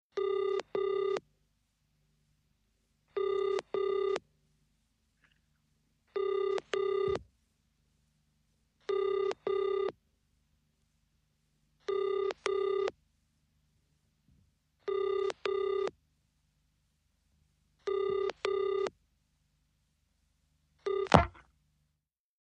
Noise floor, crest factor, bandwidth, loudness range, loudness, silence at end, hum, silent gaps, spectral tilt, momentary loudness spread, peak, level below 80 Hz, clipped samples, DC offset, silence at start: -84 dBFS; 34 dB; 9.4 kHz; 3 LU; -33 LUFS; 1 s; none; none; -6 dB/octave; 7 LU; -2 dBFS; -58 dBFS; under 0.1%; under 0.1%; 0.15 s